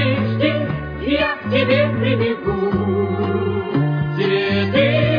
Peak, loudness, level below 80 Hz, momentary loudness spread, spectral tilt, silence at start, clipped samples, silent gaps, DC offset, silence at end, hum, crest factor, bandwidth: -4 dBFS; -18 LUFS; -40 dBFS; 5 LU; -9 dB/octave; 0 s; under 0.1%; none; under 0.1%; 0 s; none; 14 dB; 5.2 kHz